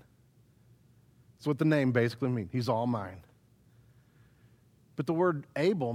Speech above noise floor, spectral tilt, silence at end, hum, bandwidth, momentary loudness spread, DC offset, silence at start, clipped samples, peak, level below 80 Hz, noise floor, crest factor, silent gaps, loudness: 34 dB; -8 dB/octave; 0 s; none; 15 kHz; 11 LU; under 0.1%; 1.4 s; under 0.1%; -14 dBFS; -70 dBFS; -63 dBFS; 18 dB; none; -30 LUFS